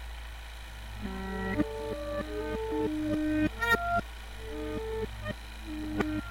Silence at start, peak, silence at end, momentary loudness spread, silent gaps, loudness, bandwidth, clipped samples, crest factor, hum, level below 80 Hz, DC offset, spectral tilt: 0 s; -12 dBFS; 0 s; 16 LU; none; -33 LUFS; 16.5 kHz; under 0.1%; 22 dB; none; -42 dBFS; under 0.1%; -6 dB/octave